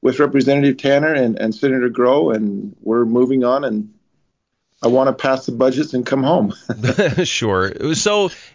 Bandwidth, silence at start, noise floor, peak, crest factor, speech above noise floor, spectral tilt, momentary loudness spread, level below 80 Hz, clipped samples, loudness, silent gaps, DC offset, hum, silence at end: 7.6 kHz; 0.05 s; -70 dBFS; -2 dBFS; 14 dB; 54 dB; -5.5 dB/octave; 6 LU; -50 dBFS; under 0.1%; -17 LUFS; none; under 0.1%; none; 0.15 s